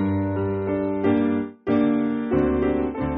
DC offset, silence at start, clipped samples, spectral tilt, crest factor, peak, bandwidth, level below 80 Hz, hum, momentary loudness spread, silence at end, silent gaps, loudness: under 0.1%; 0 s; under 0.1%; -8 dB/octave; 14 dB; -8 dBFS; 4.1 kHz; -42 dBFS; none; 4 LU; 0 s; none; -23 LUFS